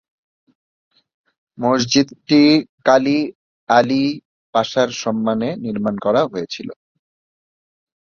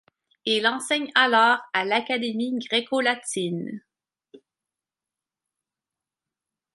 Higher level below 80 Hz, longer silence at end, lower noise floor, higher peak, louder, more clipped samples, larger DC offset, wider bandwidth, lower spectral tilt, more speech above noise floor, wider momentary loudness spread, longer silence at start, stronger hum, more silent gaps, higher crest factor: first, -60 dBFS vs -80 dBFS; second, 1.3 s vs 2.4 s; about the same, under -90 dBFS vs -89 dBFS; first, 0 dBFS vs -4 dBFS; first, -17 LUFS vs -23 LUFS; neither; neither; second, 7.2 kHz vs 11.5 kHz; first, -5 dB/octave vs -3 dB/octave; first, over 73 dB vs 66 dB; about the same, 12 LU vs 12 LU; first, 1.6 s vs 0.45 s; neither; first, 2.69-2.78 s, 3.35-3.67 s, 4.25-4.53 s vs none; about the same, 18 dB vs 22 dB